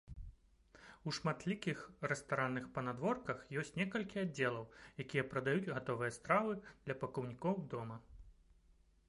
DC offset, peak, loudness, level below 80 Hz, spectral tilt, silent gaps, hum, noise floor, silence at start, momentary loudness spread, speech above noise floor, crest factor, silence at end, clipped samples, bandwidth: under 0.1%; -18 dBFS; -40 LUFS; -64 dBFS; -6 dB/octave; none; none; -70 dBFS; 0.05 s; 12 LU; 30 dB; 22 dB; 0.75 s; under 0.1%; 11.5 kHz